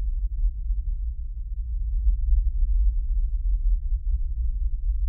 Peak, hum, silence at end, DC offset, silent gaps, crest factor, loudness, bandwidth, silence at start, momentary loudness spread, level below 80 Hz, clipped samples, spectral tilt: -10 dBFS; none; 0 s; under 0.1%; none; 12 dB; -29 LUFS; 0.3 kHz; 0 s; 7 LU; -24 dBFS; under 0.1%; -13.5 dB/octave